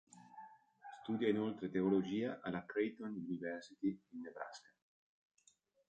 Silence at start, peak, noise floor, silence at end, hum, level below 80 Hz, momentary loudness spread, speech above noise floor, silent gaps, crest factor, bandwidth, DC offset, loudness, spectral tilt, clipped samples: 0.15 s; -22 dBFS; -74 dBFS; 1.3 s; none; -78 dBFS; 22 LU; 34 dB; none; 20 dB; 9 kHz; under 0.1%; -41 LUFS; -7 dB/octave; under 0.1%